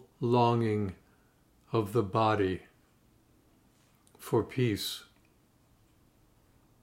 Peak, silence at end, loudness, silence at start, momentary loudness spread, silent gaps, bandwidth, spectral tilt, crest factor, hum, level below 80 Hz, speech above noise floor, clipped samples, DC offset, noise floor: -12 dBFS; 1.8 s; -30 LUFS; 0.2 s; 14 LU; none; 16 kHz; -6.5 dB/octave; 22 dB; none; -68 dBFS; 37 dB; under 0.1%; under 0.1%; -66 dBFS